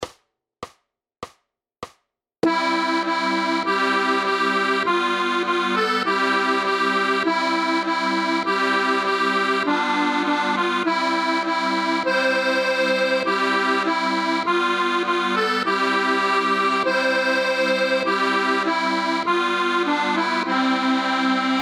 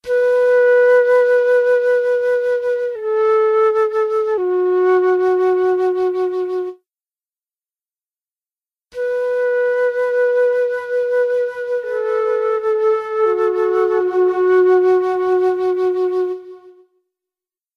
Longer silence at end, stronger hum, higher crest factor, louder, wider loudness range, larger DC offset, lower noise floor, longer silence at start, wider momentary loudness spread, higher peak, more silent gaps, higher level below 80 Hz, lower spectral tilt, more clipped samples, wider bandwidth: second, 0 s vs 1.05 s; neither; about the same, 14 dB vs 12 dB; second, -20 LUFS vs -16 LUFS; second, 1 LU vs 7 LU; neither; second, -70 dBFS vs under -90 dBFS; about the same, 0 s vs 0.05 s; second, 2 LU vs 8 LU; about the same, -6 dBFS vs -4 dBFS; neither; second, -72 dBFS vs -66 dBFS; second, -3.5 dB/octave vs -5.5 dB/octave; neither; first, 13 kHz vs 6.6 kHz